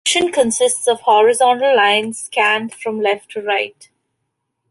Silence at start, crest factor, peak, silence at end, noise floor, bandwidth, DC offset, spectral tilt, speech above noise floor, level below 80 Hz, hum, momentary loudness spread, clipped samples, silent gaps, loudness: 0.05 s; 14 dB; -2 dBFS; 1 s; -74 dBFS; 12 kHz; under 0.1%; -1.5 dB/octave; 58 dB; -64 dBFS; none; 8 LU; under 0.1%; none; -15 LUFS